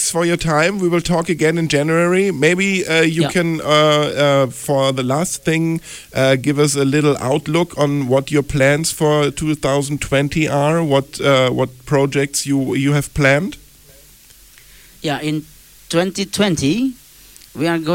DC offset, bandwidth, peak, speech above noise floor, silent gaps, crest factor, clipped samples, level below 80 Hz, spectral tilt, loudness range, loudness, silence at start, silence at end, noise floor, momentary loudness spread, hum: under 0.1%; 17 kHz; -2 dBFS; 29 dB; none; 16 dB; under 0.1%; -42 dBFS; -5 dB/octave; 6 LU; -16 LUFS; 0 s; 0 s; -45 dBFS; 6 LU; none